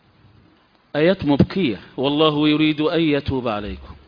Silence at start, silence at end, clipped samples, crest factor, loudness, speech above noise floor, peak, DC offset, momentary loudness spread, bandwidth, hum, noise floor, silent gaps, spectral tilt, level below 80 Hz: 0.95 s; 0.15 s; under 0.1%; 20 dB; -19 LUFS; 37 dB; 0 dBFS; under 0.1%; 9 LU; 5.2 kHz; none; -56 dBFS; none; -8.5 dB/octave; -44 dBFS